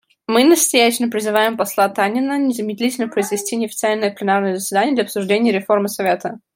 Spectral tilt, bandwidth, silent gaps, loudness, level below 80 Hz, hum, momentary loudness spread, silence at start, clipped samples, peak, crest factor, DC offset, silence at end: -3.5 dB/octave; 16.5 kHz; none; -17 LUFS; -68 dBFS; none; 7 LU; 0.3 s; under 0.1%; -2 dBFS; 16 dB; under 0.1%; 0.2 s